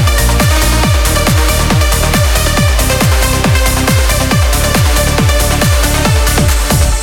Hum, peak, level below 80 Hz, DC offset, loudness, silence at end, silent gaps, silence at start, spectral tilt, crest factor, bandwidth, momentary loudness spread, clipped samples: none; 0 dBFS; -14 dBFS; under 0.1%; -10 LUFS; 0 s; none; 0 s; -4 dB/octave; 10 dB; 19 kHz; 1 LU; under 0.1%